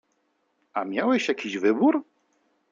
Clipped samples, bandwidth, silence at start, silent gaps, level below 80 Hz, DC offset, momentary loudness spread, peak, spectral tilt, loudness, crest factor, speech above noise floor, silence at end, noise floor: under 0.1%; 7.6 kHz; 0.75 s; none; -78 dBFS; under 0.1%; 10 LU; -10 dBFS; -5 dB/octave; -25 LUFS; 16 dB; 48 dB; 0.7 s; -72 dBFS